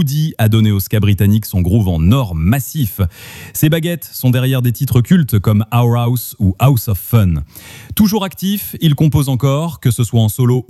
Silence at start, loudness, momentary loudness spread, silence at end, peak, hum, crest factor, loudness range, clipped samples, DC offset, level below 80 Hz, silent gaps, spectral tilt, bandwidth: 0 s; -14 LUFS; 6 LU; 0.05 s; 0 dBFS; none; 12 dB; 1 LU; under 0.1%; under 0.1%; -32 dBFS; none; -6.5 dB/octave; 15.5 kHz